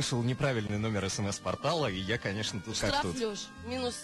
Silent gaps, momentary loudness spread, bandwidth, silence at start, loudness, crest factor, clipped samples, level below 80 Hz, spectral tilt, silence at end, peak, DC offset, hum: none; 5 LU; 12.5 kHz; 0 s; -32 LUFS; 14 dB; under 0.1%; -54 dBFS; -4.5 dB/octave; 0 s; -18 dBFS; under 0.1%; none